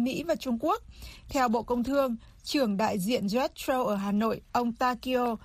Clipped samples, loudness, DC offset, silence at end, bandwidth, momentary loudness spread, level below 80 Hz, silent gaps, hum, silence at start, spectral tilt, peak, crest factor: under 0.1%; -29 LUFS; under 0.1%; 0.05 s; 15.5 kHz; 5 LU; -54 dBFS; none; none; 0 s; -5 dB/octave; -12 dBFS; 16 dB